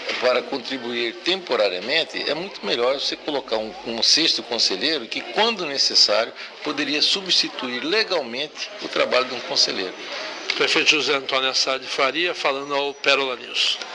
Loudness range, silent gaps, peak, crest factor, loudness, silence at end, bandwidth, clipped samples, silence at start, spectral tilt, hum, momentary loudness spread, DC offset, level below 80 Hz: 4 LU; none; -2 dBFS; 20 dB; -20 LUFS; 0 s; 10.5 kHz; under 0.1%; 0 s; -1 dB/octave; none; 11 LU; under 0.1%; -66 dBFS